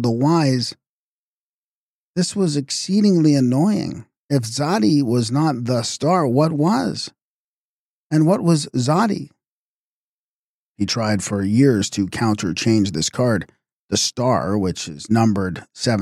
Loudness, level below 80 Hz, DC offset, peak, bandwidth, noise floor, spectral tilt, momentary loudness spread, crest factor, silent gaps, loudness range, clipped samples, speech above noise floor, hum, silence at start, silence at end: -19 LUFS; -56 dBFS; under 0.1%; -4 dBFS; 14 kHz; under -90 dBFS; -5.5 dB/octave; 9 LU; 16 dB; 0.89-2.14 s, 4.18-4.29 s, 7.22-8.10 s, 9.48-10.75 s, 13.72-13.89 s; 3 LU; under 0.1%; over 72 dB; none; 0 s; 0 s